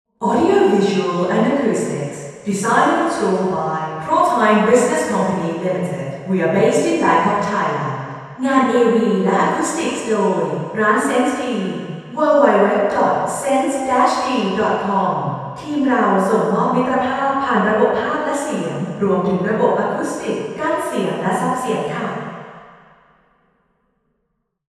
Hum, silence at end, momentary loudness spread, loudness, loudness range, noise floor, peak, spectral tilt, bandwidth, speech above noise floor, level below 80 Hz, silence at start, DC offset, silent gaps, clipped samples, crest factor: none; 2.1 s; 10 LU; -17 LUFS; 4 LU; -71 dBFS; 0 dBFS; -5.5 dB/octave; 13 kHz; 54 dB; -60 dBFS; 0.2 s; under 0.1%; none; under 0.1%; 18 dB